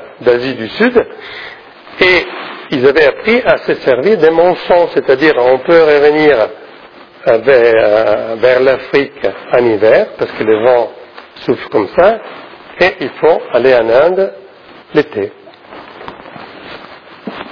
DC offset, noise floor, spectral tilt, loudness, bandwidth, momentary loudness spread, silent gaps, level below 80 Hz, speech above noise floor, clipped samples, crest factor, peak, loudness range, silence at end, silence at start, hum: under 0.1%; -37 dBFS; -6.5 dB/octave; -11 LUFS; 5.4 kHz; 21 LU; none; -46 dBFS; 27 dB; 0.3%; 12 dB; 0 dBFS; 4 LU; 0 s; 0 s; none